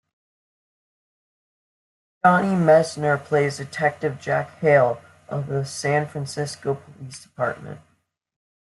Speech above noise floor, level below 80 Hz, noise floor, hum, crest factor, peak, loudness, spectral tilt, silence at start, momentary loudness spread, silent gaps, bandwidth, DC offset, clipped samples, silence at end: over 68 dB; -64 dBFS; under -90 dBFS; none; 20 dB; -2 dBFS; -22 LUFS; -6 dB/octave; 2.25 s; 15 LU; none; 12 kHz; under 0.1%; under 0.1%; 0.95 s